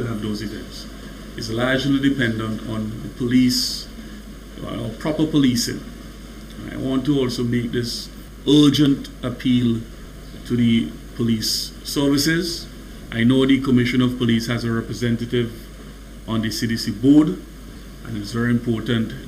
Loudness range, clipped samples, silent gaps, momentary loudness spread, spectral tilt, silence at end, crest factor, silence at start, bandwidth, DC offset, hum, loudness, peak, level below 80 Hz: 4 LU; under 0.1%; none; 21 LU; -5 dB/octave; 0 s; 16 dB; 0 s; 16 kHz; under 0.1%; none; -20 LUFS; -4 dBFS; -40 dBFS